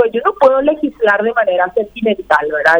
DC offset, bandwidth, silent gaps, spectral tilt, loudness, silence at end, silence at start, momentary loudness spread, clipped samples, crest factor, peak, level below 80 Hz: under 0.1%; 9.2 kHz; none; -5.5 dB/octave; -14 LUFS; 0 s; 0 s; 6 LU; under 0.1%; 12 dB; 0 dBFS; -48 dBFS